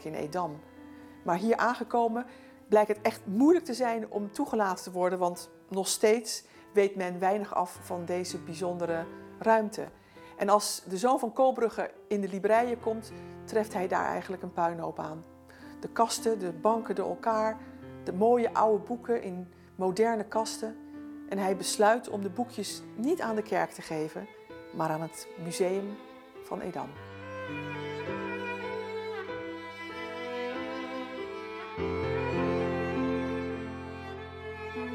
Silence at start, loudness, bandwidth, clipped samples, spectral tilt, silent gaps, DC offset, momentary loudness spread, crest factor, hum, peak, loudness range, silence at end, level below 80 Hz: 0 s; -31 LUFS; 17.5 kHz; under 0.1%; -4.5 dB/octave; none; under 0.1%; 15 LU; 22 dB; none; -10 dBFS; 8 LU; 0 s; -68 dBFS